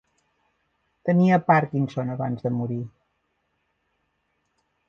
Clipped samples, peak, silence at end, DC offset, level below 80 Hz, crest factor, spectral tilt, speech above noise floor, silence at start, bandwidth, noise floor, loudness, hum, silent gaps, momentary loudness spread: under 0.1%; -4 dBFS; 2 s; under 0.1%; -66 dBFS; 22 dB; -9.5 dB/octave; 51 dB; 1.05 s; 6.8 kHz; -73 dBFS; -23 LUFS; none; none; 13 LU